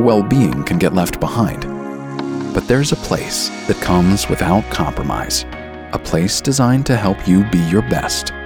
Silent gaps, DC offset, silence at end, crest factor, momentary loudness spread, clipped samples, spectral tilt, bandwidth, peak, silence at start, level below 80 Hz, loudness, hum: none; under 0.1%; 0 s; 14 dB; 11 LU; under 0.1%; -5 dB/octave; 19 kHz; -2 dBFS; 0 s; -32 dBFS; -16 LUFS; none